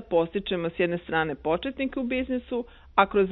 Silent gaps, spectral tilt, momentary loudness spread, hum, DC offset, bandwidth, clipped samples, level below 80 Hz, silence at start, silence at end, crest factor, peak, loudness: none; -9.5 dB/octave; 7 LU; none; under 0.1%; 4.1 kHz; under 0.1%; -50 dBFS; 0 s; 0 s; 22 dB; -4 dBFS; -27 LUFS